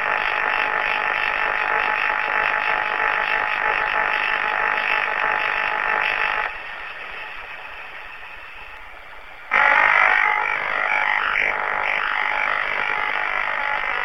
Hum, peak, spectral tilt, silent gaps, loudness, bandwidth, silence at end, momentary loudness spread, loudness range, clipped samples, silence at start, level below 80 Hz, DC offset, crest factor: none; 0 dBFS; -2.5 dB/octave; none; -19 LUFS; 14 kHz; 0 s; 17 LU; 7 LU; under 0.1%; 0 s; -52 dBFS; 0.7%; 22 dB